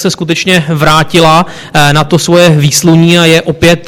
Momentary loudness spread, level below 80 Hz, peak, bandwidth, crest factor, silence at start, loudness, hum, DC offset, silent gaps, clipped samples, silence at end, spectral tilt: 4 LU; -32 dBFS; 0 dBFS; 16.5 kHz; 6 dB; 0 s; -6 LUFS; none; under 0.1%; none; 3%; 0 s; -4.5 dB/octave